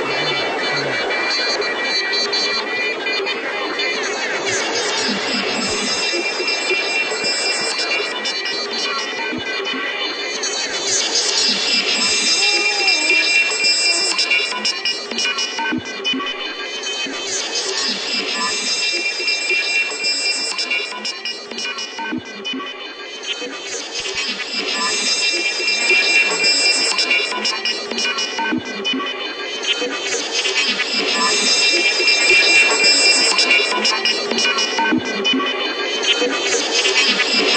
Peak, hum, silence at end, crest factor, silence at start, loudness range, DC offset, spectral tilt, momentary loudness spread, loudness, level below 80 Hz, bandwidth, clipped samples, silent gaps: -4 dBFS; none; 0 s; 16 dB; 0 s; 8 LU; under 0.1%; 0 dB/octave; 10 LU; -16 LUFS; -62 dBFS; 9.2 kHz; under 0.1%; none